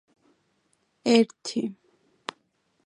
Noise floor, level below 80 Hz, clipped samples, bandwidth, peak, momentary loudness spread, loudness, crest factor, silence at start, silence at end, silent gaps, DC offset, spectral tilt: -71 dBFS; -78 dBFS; under 0.1%; 10.5 kHz; -4 dBFS; 19 LU; -25 LUFS; 24 dB; 1.05 s; 1.15 s; none; under 0.1%; -4.5 dB/octave